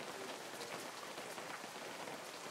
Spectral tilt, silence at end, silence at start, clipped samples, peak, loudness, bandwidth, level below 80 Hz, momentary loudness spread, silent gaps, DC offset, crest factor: -2 dB/octave; 0 s; 0 s; under 0.1%; -30 dBFS; -47 LUFS; 16 kHz; under -90 dBFS; 1 LU; none; under 0.1%; 18 dB